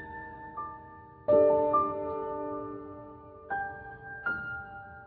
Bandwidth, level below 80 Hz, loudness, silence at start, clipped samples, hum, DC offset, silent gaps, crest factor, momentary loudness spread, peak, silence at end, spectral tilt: 4.4 kHz; -60 dBFS; -30 LUFS; 0 s; under 0.1%; none; under 0.1%; none; 20 dB; 22 LU; -12 dBFS; 0 s; -6 dB/octave